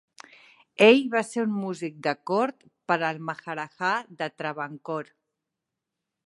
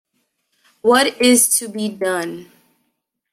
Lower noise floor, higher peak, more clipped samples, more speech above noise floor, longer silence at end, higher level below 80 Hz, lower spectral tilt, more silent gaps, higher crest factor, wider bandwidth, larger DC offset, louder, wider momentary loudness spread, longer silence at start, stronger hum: first, -85 dBFS vs -73 dBFS; about the same, -4 dBFS vs -2 dBFS; neither; first, 60 dB vs 56 dB; first, 1.25 s vs 0.9 s; second, -82 dBFS vs -62 dBFS; first, -5 dB/octave vs -2 dB/octave; neither; first, 24 dB vs 18 dB; second, 11.5 kHz vs 16 kHz; neither; second, -26 LUFS vs -16 LUFS; first, 17 LU vs 14 LU; about the same, 0.8 s vs 0.85 s; neither